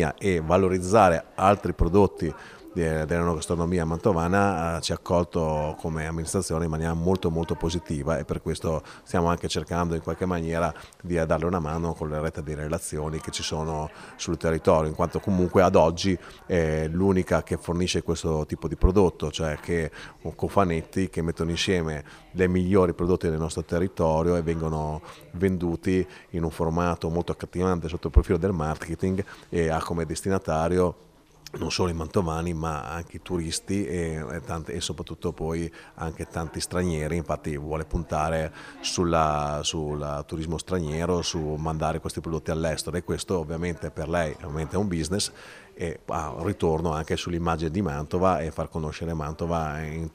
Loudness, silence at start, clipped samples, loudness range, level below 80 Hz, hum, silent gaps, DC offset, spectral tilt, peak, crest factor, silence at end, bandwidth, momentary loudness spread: -26 LUFS; 0 s; under 0.1%; 6 LU; -38 dBFS; none; none; under 0.1%; -6 dB/octave; -4 dBFS; 22 dB; 0.05 s; 15.5 kHz; 10 LU